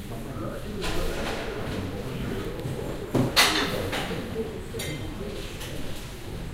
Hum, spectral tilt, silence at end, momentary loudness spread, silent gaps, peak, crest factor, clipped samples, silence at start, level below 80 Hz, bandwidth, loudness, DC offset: none; -4 dB/octave; 0 s; 14 LU; none; -6 dBFS; 24 dB; under 0.1%; 0 s; -38 dBFS; 16 kHz; -29 LUFS; under 0.1%